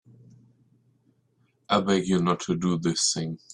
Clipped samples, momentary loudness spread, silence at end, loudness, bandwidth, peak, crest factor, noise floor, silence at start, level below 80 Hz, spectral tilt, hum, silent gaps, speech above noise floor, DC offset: under 0.1%; 3 LU; 0.15 s; -25 LUFS; 11 kHz; -8 dBFS; 20 dB; -68 dBFS; 1.7 s; -62 dBFS; -4.5 dB/octave; none; none; 43 dB; under 0.1%